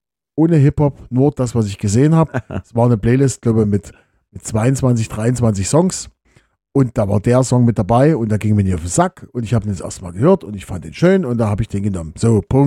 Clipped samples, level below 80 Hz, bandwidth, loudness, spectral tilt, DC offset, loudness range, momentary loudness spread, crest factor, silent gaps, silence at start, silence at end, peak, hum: under 0.1%; -38 dBFS; 12.5 kHz; -16 LUFS; -7 dB/octave; under 0.1%; 2 LU; 11 LU; 16 dB; none; 0.35 s; 0 s; 0 dBFS; none